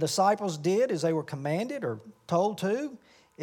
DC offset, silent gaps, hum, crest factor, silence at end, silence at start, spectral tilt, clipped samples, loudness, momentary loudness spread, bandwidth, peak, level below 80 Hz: under 0.1%; none; none; 18 dB; 0 s; 0 s; -5.5 dB/octave; under 0.1%; -29 LUFS; 9 LU; 18 kHz; -12 dBFS; -80 dBFS